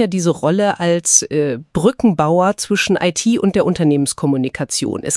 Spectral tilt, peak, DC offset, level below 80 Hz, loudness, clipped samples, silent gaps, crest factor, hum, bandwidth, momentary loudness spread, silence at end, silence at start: -4.5 dB/octave; 0 dBFS; under 0.1%; -48 dBFS; -16 LUFS; under 0.1%; none; 16 dB; none; 12 kHz; 7 LU; 0 s; 0 s